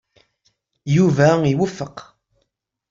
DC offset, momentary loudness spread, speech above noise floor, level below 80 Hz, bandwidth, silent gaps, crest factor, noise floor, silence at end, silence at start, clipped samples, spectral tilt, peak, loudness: under 0.1%; 20 LU; 56 dB; -54 dBFS; 7.6 kHz; none; 18 dB; -73 dBFS; 0.9 s; 0.85 s; under 0.1%; -7 dB/octave; -2 dBFS; -17 LUFS